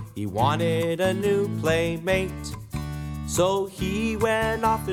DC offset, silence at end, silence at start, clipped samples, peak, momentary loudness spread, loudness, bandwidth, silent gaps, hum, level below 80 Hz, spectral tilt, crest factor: under 0.1%; 0 s; 0 s; under 0.1%; -8 dBFS; 10 LU; -25 LUFS; 17.5 kHz; none; none; -42 dBFS; -5.5 dB/octave; 16 dB